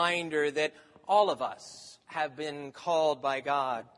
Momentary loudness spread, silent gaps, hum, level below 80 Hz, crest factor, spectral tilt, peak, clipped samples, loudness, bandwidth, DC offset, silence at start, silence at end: 16 LU; none; none; -80 dBFS; 18 dB; -3.5 dB/octave; -12 dBFS; under 0.1%; -30 LUFS; 11.5 kHz; under 0.1%; 0 s; 0.15 s